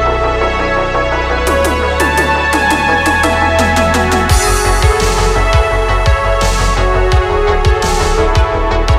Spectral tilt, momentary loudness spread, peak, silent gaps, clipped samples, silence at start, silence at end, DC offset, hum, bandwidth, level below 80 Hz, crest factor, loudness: -4.5 dB/octave; 3 LU; 0 dBFS; none; under 0.1%; 0 s; 0 s; under 0.1%; none; 15.5 kHz; -16 dBFS; 12 dB; -12 LUFS